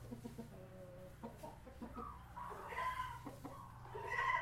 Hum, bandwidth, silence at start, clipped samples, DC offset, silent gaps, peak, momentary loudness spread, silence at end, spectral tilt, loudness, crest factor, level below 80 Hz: 60 Hz at -60 dBFS; 16.5 kHz; 0 s; under 0.1%; under 0.1%; none; -26 dBFS; 13 LU; 0 s; -5 dB/octave; -48 LUFS; 22 dB; -62 dBFS